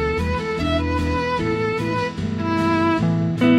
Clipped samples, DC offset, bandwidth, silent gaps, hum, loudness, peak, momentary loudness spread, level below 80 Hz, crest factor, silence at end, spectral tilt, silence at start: under 0.1%; under 0.1%; 12 kHz; none; none; -21 LUFS; -4 dBFS; 5 LU; -34 dBFS; 16 dB; 0 s; -7 dB/octave; 0 s